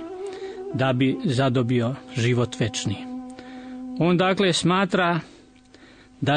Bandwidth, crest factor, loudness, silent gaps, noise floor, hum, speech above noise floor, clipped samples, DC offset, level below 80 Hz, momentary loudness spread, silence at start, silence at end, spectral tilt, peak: 9.6 kHz; 14 dB; -23 LUFS; none; -50 dBFS; none; 29 dB; under 0.1%; under 0.1%; -60 dBFS; 16 LU; 0 s; 0 s; -5.5 dB/octave; -8 dBFS